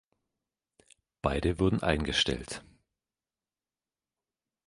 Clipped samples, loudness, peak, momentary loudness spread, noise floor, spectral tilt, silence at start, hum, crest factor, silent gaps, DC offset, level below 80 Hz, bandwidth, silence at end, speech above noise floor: under 0.1%; -29 LUFS; -8 dBFS; 12 LU; under -90 dBFS; -5 dB/octave; 1.25 s; none; 26 dB; none; under 0.1%; -46 dBFS; 11.5 kHz; 2.05 s; over 61 dB